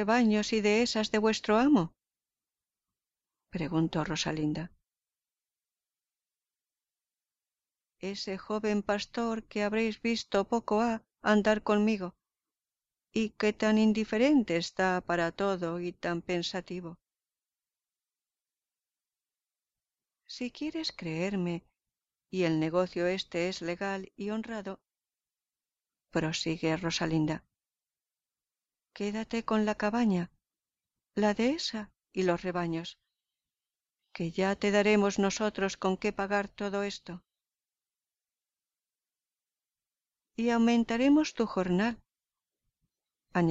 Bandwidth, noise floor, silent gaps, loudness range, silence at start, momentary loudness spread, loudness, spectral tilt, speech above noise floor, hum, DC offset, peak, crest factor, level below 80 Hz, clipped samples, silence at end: 8 kHz; under -90 dBFS; none; 10 LU; 0 s; 13 LU; -30 LUFS; -5.5 dB/octave; over 60 dB; none; under 0.1%; -14 dBFS; 18 dB; -62 dBFS; under 0.1%; 0 s